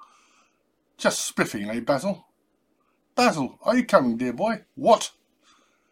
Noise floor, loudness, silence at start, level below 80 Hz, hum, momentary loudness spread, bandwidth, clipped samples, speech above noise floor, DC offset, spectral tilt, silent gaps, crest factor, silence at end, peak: -70 dBFS; -24 LUFS; 1 s; -66 dBFS; none; 9 LU; 16.5 kHz; under 0.1%; 47 dB; under 0.1%; -4 dB/octave; none; 24 dB; 0.8 s; -2 dBFS